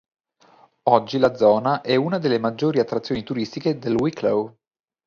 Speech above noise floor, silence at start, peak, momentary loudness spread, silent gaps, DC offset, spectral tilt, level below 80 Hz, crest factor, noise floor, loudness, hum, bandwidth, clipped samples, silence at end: 35 dB; 0.85 s; 0 dBFS; 8 LU; none; under 0.1%; -7 dB/octave; -58 dBFS; 22 dB; -55 dBFS; -21 LUFS; none; 7.2 kHz; under 0.1%; 0.55 s